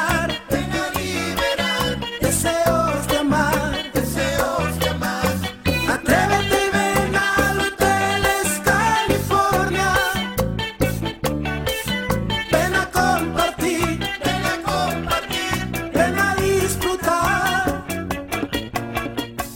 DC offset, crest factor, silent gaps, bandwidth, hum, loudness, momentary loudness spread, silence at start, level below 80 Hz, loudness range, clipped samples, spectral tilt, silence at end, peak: under 0.1%; 14 dB; none; 17 kHz; none; -20 LUFS; 6 LU; 0 s; -36 dBFS; 3 LU; under 0.1%; -4 dB/octave; 0 s; -6 dBFS